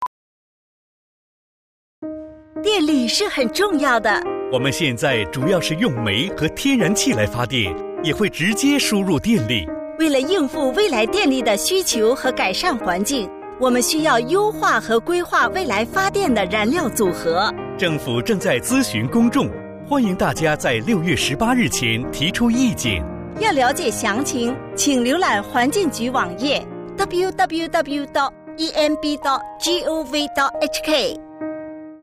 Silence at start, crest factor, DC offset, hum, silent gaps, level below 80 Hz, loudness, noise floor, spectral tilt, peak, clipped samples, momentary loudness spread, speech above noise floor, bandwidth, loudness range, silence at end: 0 s; 12 dB; under 0.1%; none; 0.07-2.02 s; -46 dBFS; -19 LUFS; under -90 dBFS; -4 dB/octave; -6 dBFS; under 0.1%; 6 LU; over 71 dB; 15.5 kHz; 3 LU; 0.05 s